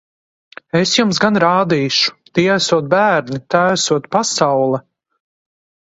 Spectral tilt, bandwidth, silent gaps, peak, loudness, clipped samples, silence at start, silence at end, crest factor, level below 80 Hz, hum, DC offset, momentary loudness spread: -4 dB/octave; 8 kHz; none; 0 dBFS; -15 LUFS; under 0.1%; 0.75 s; 1.15 s; 16 dB; -58 dBFS; none; under 0.1%; 5 LU